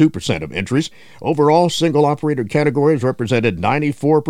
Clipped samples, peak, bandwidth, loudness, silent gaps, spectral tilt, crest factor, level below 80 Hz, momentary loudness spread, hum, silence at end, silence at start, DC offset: under 0.1%; -2 dBFS; 13.5 kHz; -17 LUFS; none; -6.5 dB/octave; 14 dB; -48 dBFS; 8 LU; none; 0 s; 0 s; under 0.1%